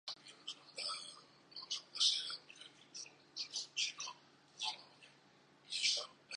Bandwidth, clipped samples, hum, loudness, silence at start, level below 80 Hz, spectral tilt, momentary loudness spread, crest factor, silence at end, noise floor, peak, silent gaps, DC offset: 10 kHz; under 0.1%; none; -39 LUFS; 0.05 s; under -90 dBFS; 2 dB/octave; 20 LU; 24 dB; 0 s; -67 dBFS; -20 dBFS; none; under 0.1%